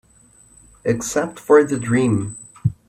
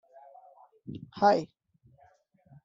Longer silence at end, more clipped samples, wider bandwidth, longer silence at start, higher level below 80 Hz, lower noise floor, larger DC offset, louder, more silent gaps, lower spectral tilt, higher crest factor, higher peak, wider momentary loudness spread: second, 0.15 s vs 1.2 s; neither; first, 15 kHz vs 7.6 kHz; about the same, 0.85 s vs 0.9 s; first, -52 dBFS vs -74 dBFS; second, -52 dBFS vs -64 dBFS; neither; first, -19 LUFS vs -26 LUFS; neither; first, -6 dB/octave vs -4.5 dB/octave; about the same, 18 dB vs 22 dB; first, -2 dBFS vs -10 dBFS; second, 11 LU vs 22 LU